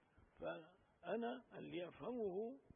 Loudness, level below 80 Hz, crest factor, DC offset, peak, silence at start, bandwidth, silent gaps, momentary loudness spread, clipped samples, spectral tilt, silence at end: -49 LUFS; -80 dBFS; 16 dB; under 0.1%; -32 dBFS; 0.15 s; 3.6 kHz; none; 10 LU; under 0.1%; -3 dB/octave; 0.15 s